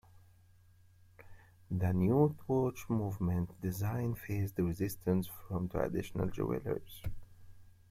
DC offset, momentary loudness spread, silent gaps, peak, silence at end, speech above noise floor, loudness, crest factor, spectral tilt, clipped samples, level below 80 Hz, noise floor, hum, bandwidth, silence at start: under 0.1%; 10 LU; none; -16 dBFS; 0.2 s; 29 dB; -35 LUFS; 20 dB; -8 dB/octave; under 0.1%; -56 dBFS; -63 dBFS; none; 16.5 kHz; 0.15 s